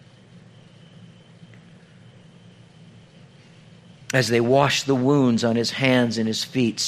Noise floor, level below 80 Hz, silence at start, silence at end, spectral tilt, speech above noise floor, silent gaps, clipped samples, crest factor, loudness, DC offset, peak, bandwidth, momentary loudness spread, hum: -49 dBFS; -62 dBFS; 0.35 s; 0 s; -5 dB/octave; 29 dB; none; under 0.1%; 22 dB; -20 LUFS; under 0.1%; -2 dBFS; 15 kHz; 5 LU; none